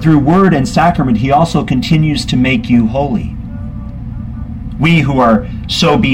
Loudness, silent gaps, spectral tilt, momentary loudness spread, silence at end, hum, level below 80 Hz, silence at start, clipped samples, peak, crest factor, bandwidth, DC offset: -11 LUFS; none; -6.5 dB/octave; 15 LU; 0 s; none; -28 dBFS; 0 s; under 0.1%; 0 dBFS; 12 dB; 12 kHz; under 0.1%